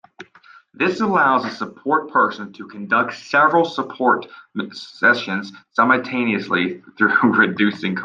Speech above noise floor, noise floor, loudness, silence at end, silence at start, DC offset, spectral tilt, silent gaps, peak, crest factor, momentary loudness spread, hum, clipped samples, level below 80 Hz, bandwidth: 30 dB; -49 dBFS; -18 LUFS; 0 s; 0.2 s; under 0.1%; -6 dB/octave; none; -2 dBFS; 18 dB; 13 LU; none; under 0.1%; -68 dBFS; 7.6 kHz